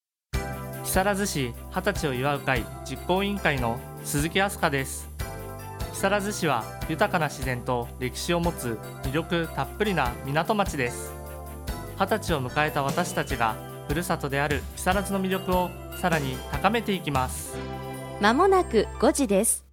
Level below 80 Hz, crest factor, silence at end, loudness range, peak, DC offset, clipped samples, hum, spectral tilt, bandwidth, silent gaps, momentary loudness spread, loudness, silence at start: -40 dBFS; 20 dB; 0.1 s; 3 LU; -6 dBFS; under 0.1%; under 0.1%; none; -4.5 dB/octave; 19 kHz; none; 12 LU; -27 LUFS; 0.35 s